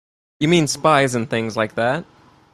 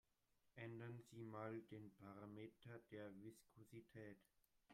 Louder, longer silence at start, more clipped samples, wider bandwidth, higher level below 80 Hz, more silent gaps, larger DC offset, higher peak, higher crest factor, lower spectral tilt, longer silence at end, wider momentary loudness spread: first, -19 LUFS vs -59 LUFS; about the same, 0.4 s vs 0.45 s; neither; about the same, 14.5 kHz vs 15 kHz; first, -56 dBFS vs -88 dBFS; neither; neither; first, -2 dBFS vs -40 dBFS; about the same, 18 dB vs 20 dB; second, -5 dB/octave vs -7 dB/octave; first, 0.5 s vs 0 s; second, 7 LU vs 10 LU